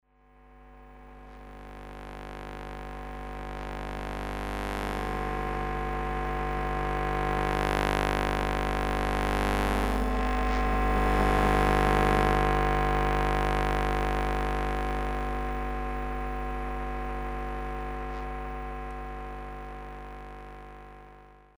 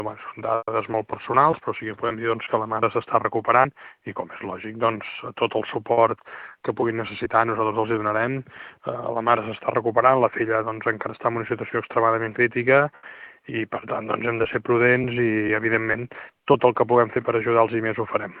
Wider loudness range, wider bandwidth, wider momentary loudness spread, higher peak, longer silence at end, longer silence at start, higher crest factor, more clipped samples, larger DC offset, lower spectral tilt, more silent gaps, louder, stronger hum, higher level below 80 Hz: first, 14 LU vs 3 LU; first, over 20 kHz vs 4.6 kHz; first, 18 LU vs 13 LU; second, -8 dBFS vs -2 dBFS; first, 0.3 s vs 0 s; first, 0.45 s vs 0 s; about the same, 22 dB vs 20 dB; neither; neither; second, -6 dB/octave vs -10 dB/octave; neither; second, -30 LUFS vs -23 LUFS; first, 50 Hz at -30 dBFS vs none; first, -34 dBFS vs -62 dBFS